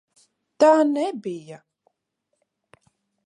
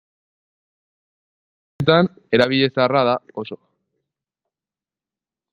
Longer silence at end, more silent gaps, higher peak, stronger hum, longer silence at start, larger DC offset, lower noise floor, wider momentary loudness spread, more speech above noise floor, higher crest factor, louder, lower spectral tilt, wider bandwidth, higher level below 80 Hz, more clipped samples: second, 1.7 s vs 1.95 s; neither; about the same, -4 dBFS vs -2 dBFS; neither; second, 0.6 s vs 1.8 s; neither; second, -77 dBFS vs under -90 dBFS; about the same, 17 LU vs 16 LU; second, 57 dB vs over 72 dB; about the same, 20 dB vs 22 dB; about the same, -20 LUFS vs -18 LUFS; second, -5 dB/octave vs -7 dB/octave; about the same, 11 kHz vs 10.5 kHz; second, -80 dBFS vs -60 dBFS; neither